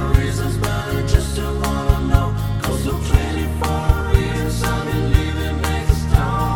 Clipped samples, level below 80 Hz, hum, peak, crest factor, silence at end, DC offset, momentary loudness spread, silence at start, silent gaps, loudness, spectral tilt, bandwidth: under 0.1%; -20 dBFS; none; 0 dBFS; 18 dB; 0 s; 0.5%; 4 LU; 0 s; none; -19 LUFS; -6 dB/octave; 18 kHz